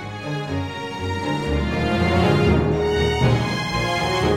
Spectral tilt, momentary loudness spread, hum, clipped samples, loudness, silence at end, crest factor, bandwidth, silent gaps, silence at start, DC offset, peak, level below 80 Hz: -6 dB/octave; 9 LU; none; under 0.1%; -21 LUFS; 0 s; 16 dB; 15 kHz; none; 0 s; under 0.1%; -6 dBFS; -32 dBFS